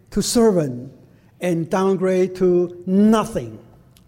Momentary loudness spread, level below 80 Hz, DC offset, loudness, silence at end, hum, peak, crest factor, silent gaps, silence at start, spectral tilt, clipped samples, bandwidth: 11 LU; -46 dBFS; under 0.1%; -19 LUFS; 0.45 s; none; -4 dBFS; 16 dB; none; 0.1 s; -6 dB/octave; under 0.1%; 16.5 kHz